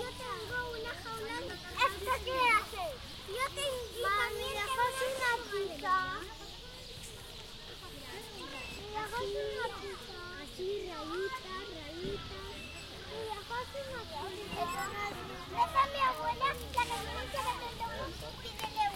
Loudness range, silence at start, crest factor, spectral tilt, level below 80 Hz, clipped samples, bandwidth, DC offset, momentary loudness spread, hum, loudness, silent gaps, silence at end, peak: 8 LU; 0 s; 22 dB; -3 dB/octave; -54 dBFS; under 0.1%; 16.5 kHz; under 0.1%; 13 LU; none; -36 LUFS; none; 0 s; -16 dBFS